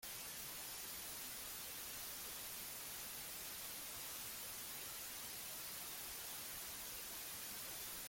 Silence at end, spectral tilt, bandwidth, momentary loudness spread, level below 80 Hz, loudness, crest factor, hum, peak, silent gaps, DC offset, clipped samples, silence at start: 0 s; 0 dB/octave; 17 kHz; 1 LU; -72 dBFS; -47 LUFS; 14 dB; none; -36 dBFS; none; under 0.1%; under 0.1%; 0 s